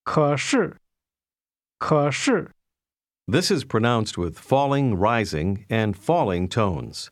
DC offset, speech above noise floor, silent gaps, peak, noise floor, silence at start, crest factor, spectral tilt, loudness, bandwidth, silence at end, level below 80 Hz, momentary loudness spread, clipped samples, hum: under 0.1%; over 68 dB; none; -4 dBFS; under -90 dBFS; 0.05 s; 18 dB; -5.5 dB/octave; -23 LUFS; 14.5 kHz; 0.05 s; -50 dBFS; 8 LU; under 0.1%; none